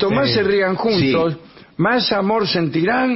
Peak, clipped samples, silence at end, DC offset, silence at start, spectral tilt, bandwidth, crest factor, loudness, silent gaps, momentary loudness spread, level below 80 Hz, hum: -6 dBFS; under 0.1%; 0 s; under 0.1%; 0 s; -9 dB/octave; 5.8 kHz; 12 dB; -17 LUFS; none; 6 LU; -50 dBFS; none